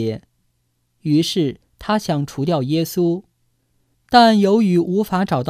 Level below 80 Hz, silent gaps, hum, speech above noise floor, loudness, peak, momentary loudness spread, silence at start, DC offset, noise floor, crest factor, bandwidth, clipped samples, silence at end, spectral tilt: -52 dBFS; none; none; 50 dB; -18 LUFS; 0 dBFS; 13 LU; 0 s; under 0.1%; -67 dBFS; 18 dB; 16 kHz; under 0.1%; 0 s; -6 dB/octave